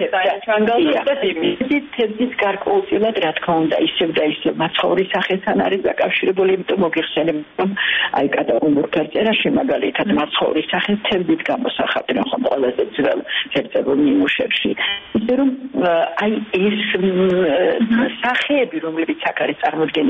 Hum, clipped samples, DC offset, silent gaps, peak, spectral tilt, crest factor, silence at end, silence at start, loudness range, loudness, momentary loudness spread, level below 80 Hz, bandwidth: none; under 0.1%; under 0.1%; none; -6 dBFS; -7 dB/octave; 12 dB; 0 s; 0 s; 1 LU; -18 LUFS; 4 LU; -54 dBFS; 6.6 kHz